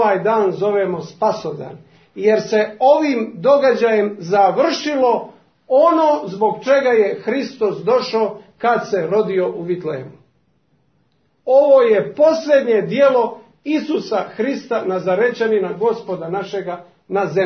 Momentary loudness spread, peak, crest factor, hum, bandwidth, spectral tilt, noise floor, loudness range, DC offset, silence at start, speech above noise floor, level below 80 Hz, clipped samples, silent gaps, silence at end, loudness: 10 LU; -2 dBFS; 16 dB; none; 6.6 kHz; -6 dB/octave; -62 dBFS; 5 LU; under 0.1%; 0 s; 46 dB; -68 dBFS; under 0.1%; none; 0 s; -17 LUFS